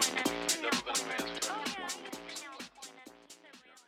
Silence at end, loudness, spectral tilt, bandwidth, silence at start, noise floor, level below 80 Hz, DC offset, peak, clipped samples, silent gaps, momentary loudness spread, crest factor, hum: 0.05 s; -34 LUFS; -1 dB/octave; over 20 kHz; 0 s; -58 dBFS; -70 dBFS; under 0.1%; -18 dBFS; under 0.1%; none; 22 LU; 20 dB; none